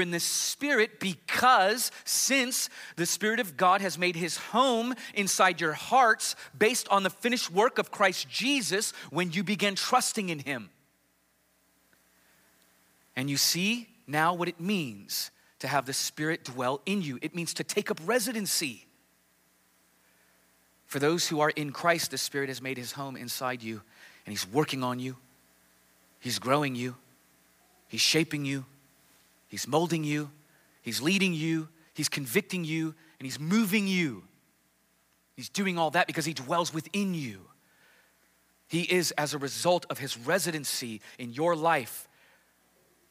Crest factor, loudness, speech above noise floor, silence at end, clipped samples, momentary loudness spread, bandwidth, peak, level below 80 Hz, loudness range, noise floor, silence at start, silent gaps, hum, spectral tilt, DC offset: 20 dB; -28 LUFS; 41 dB; 1.05 s; under 0.1%; 13 LU; 16 kHz; -10 dBFS; -80 dBFS; 7 LU; -70 dBFS; 0 s; none; none; -3 dB/octave; under 0.1%